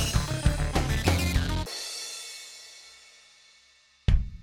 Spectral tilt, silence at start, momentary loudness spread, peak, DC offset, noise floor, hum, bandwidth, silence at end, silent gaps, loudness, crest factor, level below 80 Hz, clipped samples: -4.5 dB/octave; 0 s; 20 LU; -8 dBFS; under 0.1%; -61 dBFS; none; 17 kHz; 0 s; none; -29 LUFS; 20 dB; -32 dBFS; under 0.1%